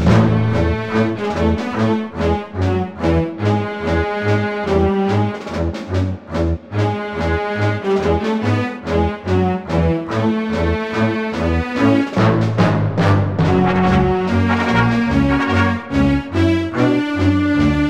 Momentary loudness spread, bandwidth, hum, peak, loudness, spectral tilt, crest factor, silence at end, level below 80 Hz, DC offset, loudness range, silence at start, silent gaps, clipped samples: 5 LU; 9.4 kHz; none; -2 dBFS; -17 LUFS; -7.5 dB/octave; 16 dB; 0 s; -30 dBFS; under 0.1%; 4 LU; 0 s; none; under 0.1%